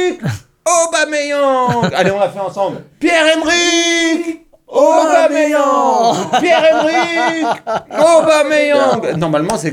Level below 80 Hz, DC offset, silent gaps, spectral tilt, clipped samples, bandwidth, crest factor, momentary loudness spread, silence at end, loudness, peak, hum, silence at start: -52 dBFS; under 0.1%; none; -3.5 dB/octave; under 0.1%; 15.5 kHz; 12 dB; 9 LU; 0 s; -13 LUFS; 0 dBFS; none; 0 s